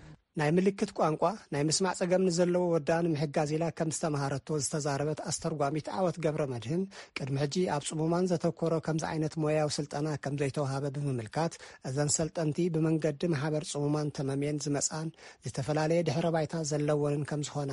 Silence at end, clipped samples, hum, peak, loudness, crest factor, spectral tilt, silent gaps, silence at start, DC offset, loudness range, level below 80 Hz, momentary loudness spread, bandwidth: 0 s; under 0.1%; none; -14 dBFS; -31 LUFS; 18 dB; -5.5 dB/octave; none; 0 s; under 0.1%; 3 LU; -64 dBFS; 6 LU; 11.5 kHz